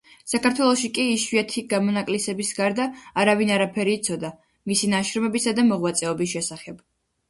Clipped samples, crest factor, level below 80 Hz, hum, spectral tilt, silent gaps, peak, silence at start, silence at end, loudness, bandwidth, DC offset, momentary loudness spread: under 0.1%; 18 dB; -62 dBFS; none; -3.5 dB/octave; none; -4 dBFS; 0.25 s; 0.55 s; -23 LUFS; 11.5 kHz; under 0.1%; 8 LU